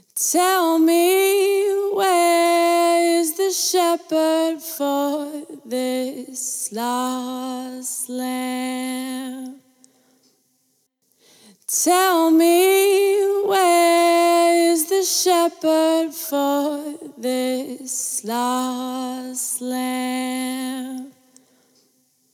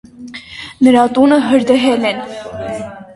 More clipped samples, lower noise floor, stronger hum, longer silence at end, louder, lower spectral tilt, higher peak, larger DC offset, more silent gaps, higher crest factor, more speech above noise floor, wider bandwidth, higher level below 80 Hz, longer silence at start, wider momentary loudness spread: neither; first, -67 dBFS vs -32 dBFS; neither; first, 1.25 s vs 0 s; second, -19 LUFS vs -12 LUFS; second, -1 dB/octave vs -5 dB/octave; second, -6 dBFS vs 0 dBFS; neither; neither; about the same, 14 dB vs 14 dB; first, 47 dB vs 21 dB; first, 17.5 kHz vs 11.5 kHz; second, -86 dBFS vs -48 dBFS; about the same, 0.15 s vs 0.2 s; second, 13 LU vs 19 LU